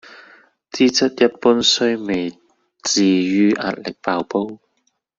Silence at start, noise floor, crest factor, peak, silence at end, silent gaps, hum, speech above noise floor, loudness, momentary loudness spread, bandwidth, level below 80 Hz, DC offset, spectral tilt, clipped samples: 0.05 s; -68 dBFS; 18 dB; -2 dBFS; 0.6 s; none; none; 51 dB; -18 LUFS; 11 LU; 8 kHz; -60 dBFS; under 0.1%; -3.5 dB/octave; under 0.1%